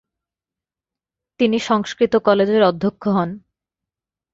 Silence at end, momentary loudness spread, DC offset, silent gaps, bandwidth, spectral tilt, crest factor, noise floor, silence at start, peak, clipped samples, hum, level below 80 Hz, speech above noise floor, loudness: 0.95 s; 7 LU; under 0.1%; none; 7.8 kHz; -6 dB/octave; 18 dB; -89 dBFS; 1.4 s; -2 dBFS; under 0.1%; none; -60 dBFS; 72 dB; -18 LUFS